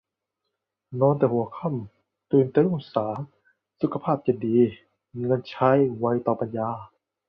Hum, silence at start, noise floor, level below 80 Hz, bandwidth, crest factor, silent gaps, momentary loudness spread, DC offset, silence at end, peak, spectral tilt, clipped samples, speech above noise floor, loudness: none; 0.9 s; -83 dBFS; -64 dBFS; 5.6 kHz; 18 dB; none; 14 LU; under 0.1%; 0.4 s; -6 dBFS; -11 dB/octave; under 0.1%; 59 dB; -24 LUFS